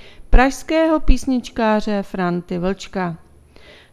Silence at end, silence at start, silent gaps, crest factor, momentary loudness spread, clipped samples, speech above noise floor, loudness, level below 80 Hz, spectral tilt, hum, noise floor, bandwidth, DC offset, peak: 0.75 s; 0.05 s; none; 18 dB; 8 LU; under 0.1%; 27 dB; -20 LUFS; -24 dBFS; -6 dB/octave; none; -45 dBFS; 12.5 kHz; under 0.1%; 0 dBFS